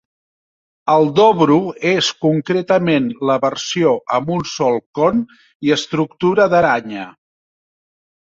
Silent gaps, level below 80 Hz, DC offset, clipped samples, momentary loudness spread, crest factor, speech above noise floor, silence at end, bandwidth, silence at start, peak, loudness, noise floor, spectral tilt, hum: 4.86-4.94 s, 5.55-5.60 s; -56 dBFS; under 0.1%; under 0.1%; 9 LU; 16 dB; over 74 dB; 1.2 s; 7.8 kHz; 0.85 s; -2 dBFS; -16 LUFS; under -90 dBFS; -5.5 dB/octave; none